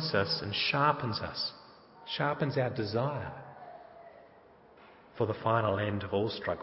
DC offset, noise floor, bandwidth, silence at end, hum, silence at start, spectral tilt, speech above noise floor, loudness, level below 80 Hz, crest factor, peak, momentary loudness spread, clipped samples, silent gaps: under 0.1%; -58 dBFS; 5.8 kHz; 0 s; none; 0 s; -9 dB/octave; 27 dB; -31 LUFS; -58 dBFS; 22 dB; -12 dBFS; 21 LU; under 0.1%; none